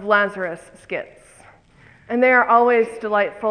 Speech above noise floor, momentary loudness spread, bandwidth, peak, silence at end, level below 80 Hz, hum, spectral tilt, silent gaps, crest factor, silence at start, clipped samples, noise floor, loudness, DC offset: 32 dB; 16 LU; 10.5 kHz; -2 dBFS; 0 s; -60 dBFS; none; -5.5 dB/octave; none; 18 dB; 0 s; under 0.1%; -50 dBFS; -18 LUFS; under 0.1%